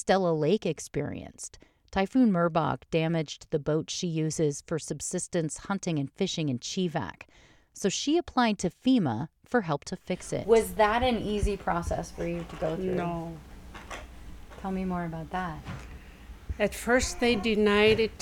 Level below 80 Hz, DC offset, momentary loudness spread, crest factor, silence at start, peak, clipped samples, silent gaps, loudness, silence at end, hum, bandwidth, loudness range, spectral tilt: -46 dBFS; under 0.1%; 18 LU; 18 dB; 0 s; -10 dBFS; under 0.1%; none; -28 LUFS; 0.05 s; none; 17.5 kHz; 7 LU; -5 dB/octave